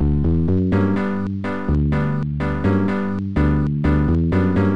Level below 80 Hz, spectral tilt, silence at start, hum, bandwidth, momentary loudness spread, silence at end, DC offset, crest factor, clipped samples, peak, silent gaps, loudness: -28 dBFS; -10 dB/octave; 0 s; none; 6 kHz; 5 LU; 0 s; 2%; 10 dB; under 0.1%; -8 dBFS; none; -20 LUFS